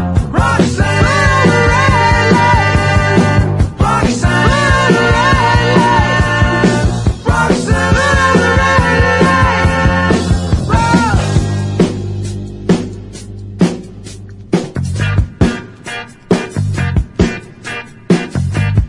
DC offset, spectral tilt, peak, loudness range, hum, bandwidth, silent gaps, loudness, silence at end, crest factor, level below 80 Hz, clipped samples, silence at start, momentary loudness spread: under 0.1%; -6 dB/octave; 0 dBFS; 8 LU; none; 11.5 kHz; none; -12 LUFS; 0 s; 12 dB; -22 dBFS; under 0.1%; 0 s; 15 LU